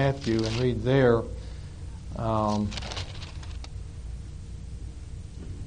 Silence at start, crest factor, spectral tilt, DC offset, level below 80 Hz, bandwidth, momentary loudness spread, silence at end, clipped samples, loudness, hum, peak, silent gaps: 0 s; 20 dB; -6.5 dB/octave; under 0.1%; -40 dBFS; 10 kHz; 18 LU; 0 s; under 0.1%; -27 LUFS; none; -10 dBFS; none